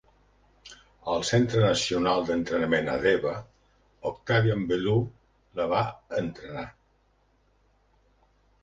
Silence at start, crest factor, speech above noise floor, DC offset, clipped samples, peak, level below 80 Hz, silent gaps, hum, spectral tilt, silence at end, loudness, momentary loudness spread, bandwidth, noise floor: 0.65 s; 18 dB; 40 dB; under 0.1%; under 0.1%; -10 dBFS; -54 dBFS; none; 50 Hz at -55 dBFS; -5.5 dB/octave; 1.9 s; -27 LUFS; 15 LU; 9.8 kHz; -66 dBFS